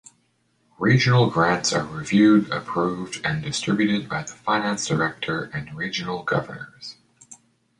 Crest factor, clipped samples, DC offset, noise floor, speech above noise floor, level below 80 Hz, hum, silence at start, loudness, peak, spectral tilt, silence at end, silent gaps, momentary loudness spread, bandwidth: 20 dB; under 0.1%; under 0.1%; -67 dBFS; 44 dB; -56 dBFS; none; 0.8 s; -22 LUFS; -4 dBFS; -5 dB/octave; 0.45 s; none; 13 LU; 11 kHz